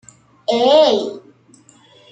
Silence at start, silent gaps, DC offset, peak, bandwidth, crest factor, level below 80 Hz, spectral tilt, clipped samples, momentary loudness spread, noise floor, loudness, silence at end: 0.5 s; none; under 0.1%; -2 dBFS; 9 kHz; 16 dB; -68 dBFS; -3.5 dB/octave; under 0.1%; 16 LU; -50 dBFS; -15 LUFS; 0.95 s